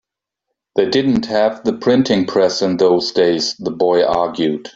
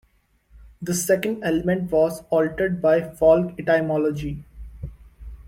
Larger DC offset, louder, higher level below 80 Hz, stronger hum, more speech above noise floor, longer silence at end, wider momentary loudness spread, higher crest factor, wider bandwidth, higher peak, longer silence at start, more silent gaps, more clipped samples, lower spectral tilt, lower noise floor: neither; first, -16 LUFS vs -21 LUFS; second, -52 dBFS vs -44 dBFS; neither; first, 63 dB vs 40 dB; about the same, 0.05 s vs 0 s; second, 5 LU vs 19 LU; about the same, 16 dB vs 18 dB; second, 7.8 kHz vs 16.5 kHz; first, 0 dBFS vs -6 dBFS; first, 0.75 s vs 0.55 s; neither; neither; about the same, -5 dB/octave vs -5.5 dB/octave; first, -78 dBFS vs -61 dBFS